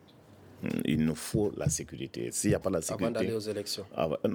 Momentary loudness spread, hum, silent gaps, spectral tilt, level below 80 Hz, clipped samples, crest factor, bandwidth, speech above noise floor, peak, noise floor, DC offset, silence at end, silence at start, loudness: 7 LU; none; none; -5 dB/octave; -54 dBFS; under 0.1%; 18 dB; 19.5 kHz; 24 dB; -14 dBFS; -55 dBFS; under 0.1%; 0 s; 0.3 s; -32 LUFS